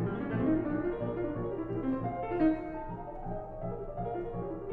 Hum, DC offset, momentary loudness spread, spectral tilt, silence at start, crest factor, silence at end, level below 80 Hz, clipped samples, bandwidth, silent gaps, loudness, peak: none; under 0.1%; 11 LU; -11 dB/octave; 0 s; 16 dB; 0 s; -48 dBFS; under 0.1%; 4.5 kHz; none; -34 LUFS; -18 dBFS